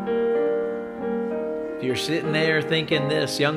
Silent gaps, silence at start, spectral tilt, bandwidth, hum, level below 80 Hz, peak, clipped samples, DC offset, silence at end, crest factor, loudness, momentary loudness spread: none; 0 s; -5 dB/octave; 15.5 kHz; none; -62 dBFS; -8 dBFS; under 0.1%; under 0.1%; 0 s; 16 dB; -24 LUFS; 7 LU